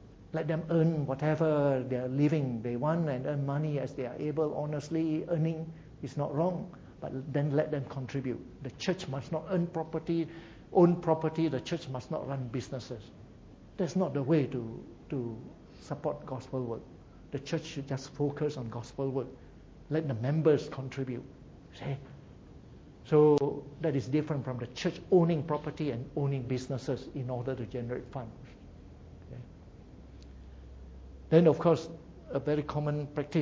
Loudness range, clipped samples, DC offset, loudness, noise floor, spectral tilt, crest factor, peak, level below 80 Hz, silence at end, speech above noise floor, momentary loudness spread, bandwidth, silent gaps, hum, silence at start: 8 LU; under 0.1%; under 0.1%; -32 LUFS; -53 dBFS; -8 dB/octave; 22 dB; -10 dBFS; -58 dBFS; 0 s; 21 dB; 23 LU; 7.8 kHz; none; none; 0 s